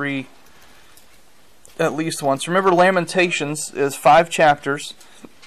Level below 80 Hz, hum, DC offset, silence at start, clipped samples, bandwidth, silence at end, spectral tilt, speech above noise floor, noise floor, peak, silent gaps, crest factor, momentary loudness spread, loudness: -58 dBFS; none; 0.5%; 0 s; under 0.1%; 14.5 kHz; 0.55 s; -4 dB/octave; 36 dB; -54 dBFS; -6 dBFS; none; 14 dB; 12 LU; -18 LUFS